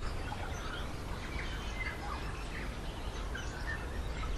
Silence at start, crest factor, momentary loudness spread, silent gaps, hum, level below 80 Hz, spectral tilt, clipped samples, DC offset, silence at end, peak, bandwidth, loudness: 0 s; 14 dB; 3 LU; none; none; -42 dBFS; -4.5 dB/octave; under 0.1%; under 0.1%; 0 s; -24 dBFS; 13.5 kHz; -41 LUFS